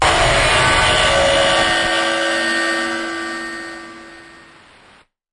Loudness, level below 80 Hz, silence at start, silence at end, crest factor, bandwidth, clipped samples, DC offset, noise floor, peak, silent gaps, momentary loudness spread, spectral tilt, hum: -15 LUFS; -34 dBFS; 0 s; 1.05 s; 16 dB; 11.5 kHz; under 0.1%; under 0.1%; -50 dBFS; -2 dBFS; none; 15 LU; -2.5 dB/octave; none